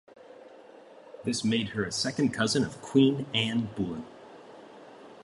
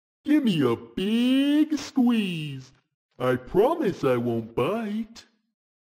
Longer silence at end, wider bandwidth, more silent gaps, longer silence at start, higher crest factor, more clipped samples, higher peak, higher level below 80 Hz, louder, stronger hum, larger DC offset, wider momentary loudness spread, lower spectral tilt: second, 0 s vs 0.6 s; second, 11.5 kHz vs 16 kHz; second, none vs 2.94-3.09 s; about the same, 0.3 s vs 0.25 s; about the same, 20 dB vs 16 dB; neither; about the same, -10 dBFS vs -10 dBFS; second, -62 dBFS vs -56 dBFS; second, -28 LUFS vs -24 LUFS; neither; neither; first, 25 LU vs 11 LU; second, -4.5 dB/octave vs -6.5 dB/octave